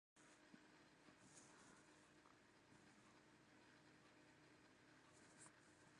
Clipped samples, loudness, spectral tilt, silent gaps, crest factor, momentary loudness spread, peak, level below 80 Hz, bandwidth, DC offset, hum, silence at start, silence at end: under 0.1%; -68 LUFS; -3 dB/octave; none; 20 dB; 3 LU; -50 dBFS; under -90 dBFS; 11 kHz; under 0.1%; none; 0.15 s; 0 s